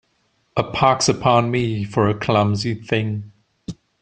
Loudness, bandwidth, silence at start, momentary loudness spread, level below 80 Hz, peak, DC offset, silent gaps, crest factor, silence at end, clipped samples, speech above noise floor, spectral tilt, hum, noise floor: -19 LUFS; 9.6 kHz; 0.55 s; 18 LU; -50 dBFS; -2 dBFS; under 0.1%; none; 18 dB; 0.3 s; under 0.1%; 47 dB; -5 dB/octave; none; -65 dBFS